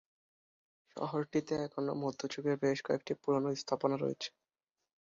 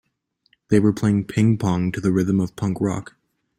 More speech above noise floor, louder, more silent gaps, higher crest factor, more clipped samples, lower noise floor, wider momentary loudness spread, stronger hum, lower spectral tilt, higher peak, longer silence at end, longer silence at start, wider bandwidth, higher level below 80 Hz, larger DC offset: first, over 55 dB vs 50 dB; second, -36 LUFS vs -21 LUFS; neither; about the same, 20 dB vs 18 dB; neither; first, under -90 dBFS vs -69 dBFS; about the same, 7 LU vs 6 LU; neither; second, -5 dB/octave vs -7.5 dB/octave; second, -16 dBFS vs -4 dBFS; first, 0.85 s vs 0.55 s; first, 0.95 s vs 0.7 s; second, 7.4 kHz vs 13 kHz; second, -76 dBFS vs -50 dBFS; neither